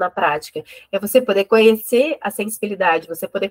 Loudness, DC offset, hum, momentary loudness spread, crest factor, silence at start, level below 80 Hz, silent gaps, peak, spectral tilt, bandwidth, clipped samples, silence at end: -18 LUFS; under 0.1%; none; 13 LU; 18 dB; 0 s; -64 dBFS; none; 0 dBFS; -4 dB/octave; 16.5 kHz; under 0.1%; 0 s